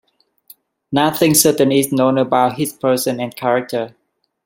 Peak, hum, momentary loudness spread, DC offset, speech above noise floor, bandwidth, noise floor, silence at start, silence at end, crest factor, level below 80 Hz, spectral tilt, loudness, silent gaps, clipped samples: 0 dBFS; none; 10 LU; under 0.1%; 33 dB; 16.5 kHz; -48 dBFS; 0.9 s; 0.55 s; 18 dB; -58 dBFS; -4 dB/octave; -16 LUFS; none; under 0.1%